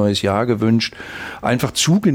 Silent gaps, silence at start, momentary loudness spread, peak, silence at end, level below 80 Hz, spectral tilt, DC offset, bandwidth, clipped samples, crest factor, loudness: none; 0 s; 10 LU; -4 dBFS; 0 s; -48 dBFS; -5 dB/octave; under 0.1%; 16.5 kHz; under 0.1%; 14 dB; -18 LUFS